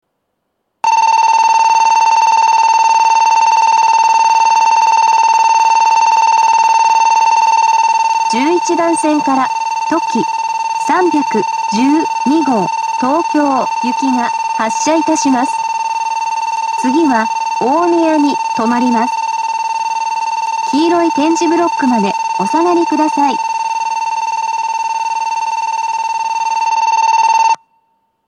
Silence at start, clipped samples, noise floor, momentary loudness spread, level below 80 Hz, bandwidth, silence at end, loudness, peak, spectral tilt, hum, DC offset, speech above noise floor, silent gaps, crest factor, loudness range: 0.85 s; under 0.1%; -69 dBFS; 7 LU; -74 dBFS; 10.5 kHz; 0.75 s; -12 LUFS; 0 dBFS; -3 dB/octave; none; under 0.1%; 57 dB; none; 12 dB; 5 LU